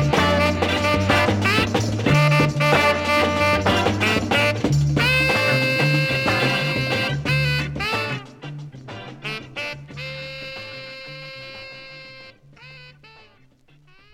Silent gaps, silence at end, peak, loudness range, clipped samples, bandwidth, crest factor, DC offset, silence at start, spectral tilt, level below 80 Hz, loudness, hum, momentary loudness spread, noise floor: none; 1.2 s; -6 dBFS; 17 LU; under 0.1%; 16.5 kHz; 16 dB; under 0.1%; 0 s; -5 dB/octave; -42 dBFS; -19 LUFS; none; 19 LU; -54 dBFS